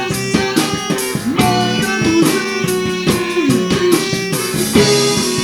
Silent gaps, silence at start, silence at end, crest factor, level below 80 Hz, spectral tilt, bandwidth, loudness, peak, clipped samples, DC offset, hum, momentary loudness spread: none; 0 s; 0 s; 14 dB; -42 dBFS; -4 dB/octave; 19 kHz; -15 LUFS; 0 dBFS; under 0.1%; under 0.1%; none; 5 LU